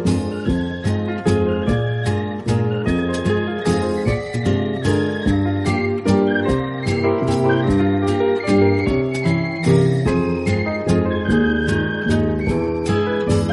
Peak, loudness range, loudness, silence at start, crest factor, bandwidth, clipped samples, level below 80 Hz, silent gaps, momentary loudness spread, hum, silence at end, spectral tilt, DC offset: -4 dBFS; 3 LU; -19 LUFS; 0 s; 14 dB; 11.5 kHz; under 0.1%; -36 dBFS; none; 5 LU; none; 0 s; -7 dB/octave; under 0.1%